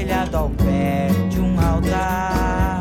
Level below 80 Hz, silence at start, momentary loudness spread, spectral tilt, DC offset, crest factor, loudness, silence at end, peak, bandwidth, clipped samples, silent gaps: -26 dBFS; 0 s; 2 LU; -7 dB/octave; under 0.1%; 12 dB; -20 LUFS; 0 s; -6 dBFS; 17 kHz; under 0.1%; none